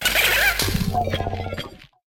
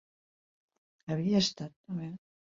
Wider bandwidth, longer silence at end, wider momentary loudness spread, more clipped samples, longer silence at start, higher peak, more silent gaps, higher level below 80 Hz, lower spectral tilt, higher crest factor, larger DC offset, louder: first, 19 kHz vs 7.8 kHz; about the same, 0.3 s vs 0.35 s; second, 15 LU vs 19 LU; neither; second, 0 s vs 1.05 s; first, -4 dBFS vs -16 dBFS; second, none vs 1.76-1.84 s; first, -36 dBFS vs -68 dBFS; second, -3 dB/octave vs -5.5 dB/octave; about the same, 18 dB vs 20 dB; neither; first, -20 LUFS vs -32 LUFS